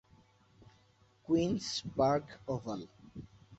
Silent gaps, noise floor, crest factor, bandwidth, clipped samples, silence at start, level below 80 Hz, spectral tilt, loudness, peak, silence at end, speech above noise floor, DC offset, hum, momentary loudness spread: none; -67 dBFS; 20 dB; 8 kHz; under 0.1%; 1.3 s; -62 dBFS; -5.5 dB/octave; -34 LUFS; -18 dBFS; 0.05 s; 34 dB; under 0.1%; none; 21 LU